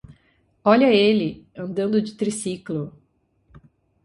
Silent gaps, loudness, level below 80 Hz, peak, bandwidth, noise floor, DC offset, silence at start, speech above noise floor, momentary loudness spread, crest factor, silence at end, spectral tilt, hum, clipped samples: none; -21 LUFS; -60 dBFS; -2 dBFS; 11.5 kHz; -64 dBFS; under 0.1%; 0.1 s; 44 dB; 15 LU; 22 dB; 0.45 s; -5.5 dB/octave; none; under 0.1%